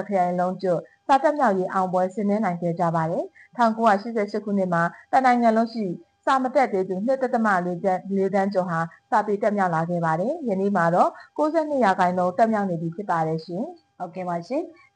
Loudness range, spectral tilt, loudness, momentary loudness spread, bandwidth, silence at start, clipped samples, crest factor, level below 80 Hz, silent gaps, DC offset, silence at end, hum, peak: 2 LU; -7.5 dB/octave; -23 LUFS; 9 LU; 9.6 kHz; 0 s; under 0.1%; 14 dB; -72 dBFS; none; under 0.1%; 0.25 s; none; -8 dBFS